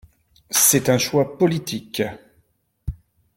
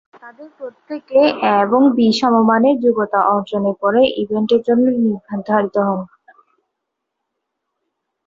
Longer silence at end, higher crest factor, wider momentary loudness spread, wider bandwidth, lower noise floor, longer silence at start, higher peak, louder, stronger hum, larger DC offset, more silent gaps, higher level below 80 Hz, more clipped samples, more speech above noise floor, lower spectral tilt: second, 0.4 s vs 2.2 s; first, 20 dB vs 14 dB; first, 20 LU vs 13 LU; first, 17 kHz vs 7.6 kHz; second, -64 dBFS vs -77 dBFS; first, 0.5 s vs 0.25 s; about the same, -2 dBFS vs -2 dBFS; second, -19 LUFS vs -15 LUFS; neither; neither; neither; first, -44 dBFS vs -60 dBFS; neither; second, 45 dB vs 62 dB; second, -3.5 dB/octave vs -6.5 dB/octave